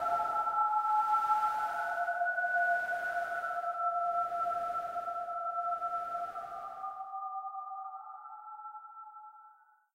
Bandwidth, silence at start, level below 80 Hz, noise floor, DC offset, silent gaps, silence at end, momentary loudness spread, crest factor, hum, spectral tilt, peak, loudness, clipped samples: 16 kHz; 0 s; -76 dBFS; -62 dBFS; under 0.1%; none; 0.4 s; 17 LU; 16 dB; none; -2.5 dB/octave; -18 dBFS; -33 LUFS; under 0.1%